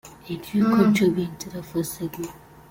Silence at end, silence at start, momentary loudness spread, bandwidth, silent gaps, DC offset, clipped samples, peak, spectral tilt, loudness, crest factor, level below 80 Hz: 0.35 s; 0.05 s; 17 LU; 17 kHz; none; under 0.1%; under 0.1%; -6 dBFS; -6 dB/octave; -23 LUFS; 18 dB; -56 dBFS